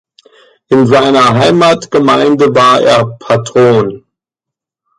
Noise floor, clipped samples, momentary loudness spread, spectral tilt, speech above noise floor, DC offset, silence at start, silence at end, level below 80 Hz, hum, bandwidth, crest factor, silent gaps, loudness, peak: -82 dBFS; under 0.1%; 6 LU; -5.5 dB/octave; 74 dB; under 0.1%; 0.7 s; 1 s; -48 dBFS; none; 11.5 kHz; 10 dB; none; -8 LUFS; 0 dBFS